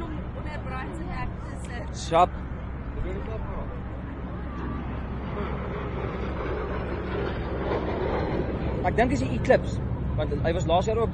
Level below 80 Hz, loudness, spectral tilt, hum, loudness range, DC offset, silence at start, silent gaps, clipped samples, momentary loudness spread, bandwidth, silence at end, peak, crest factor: -34 dBFS; -29 LUFS; -7 dB/octave; none; 7 LU; under 0.1%; 0 s; none; under 0.1%; 12 LU; 10.5 kHz; 0 s; -6 dBFS; 20 dB